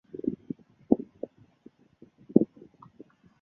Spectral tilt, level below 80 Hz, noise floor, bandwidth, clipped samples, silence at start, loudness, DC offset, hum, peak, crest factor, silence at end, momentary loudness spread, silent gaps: -12.5 dB/octave; -64 dBFS; -59 dBFS; 2.9 kHz; under 0.1%; 0.15 s; -29 LUFS; under 0.1%; none; -2 dBFS; 30 dB; 0.95 s; 17 LU; none